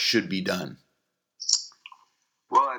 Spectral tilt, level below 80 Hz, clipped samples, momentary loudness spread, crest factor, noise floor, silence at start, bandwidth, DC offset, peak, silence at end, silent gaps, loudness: -2.5 dB/octave; -76 dBFS; under 0.1%; 13 LU; 24 dB; -78 dBFS; 0 s; over 20 kHz; under 0.1%; -6 dBFS; 0 s; none; -26 LUFS